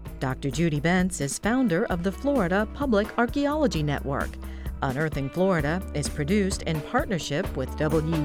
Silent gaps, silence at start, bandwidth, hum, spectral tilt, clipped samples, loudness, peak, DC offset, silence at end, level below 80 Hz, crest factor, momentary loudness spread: none; 0 s; 17.5 kHz; none; -5.5 dB/octave; under 0.1%; -26 LUFS; -10 dBFS; under 0.1%; 0 s; -38 dBFS; 16 dB; 6 LU